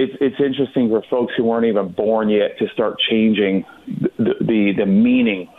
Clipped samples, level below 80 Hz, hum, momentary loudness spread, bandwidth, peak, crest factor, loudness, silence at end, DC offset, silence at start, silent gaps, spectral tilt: under 0.1%; -56 dBFS; none; 5 LU; 4 kHz; -6 dBFS; 10 dB; -18 LUFS; 0.1 s; under 0.1%; 0 s; none; -8.5 dB/octave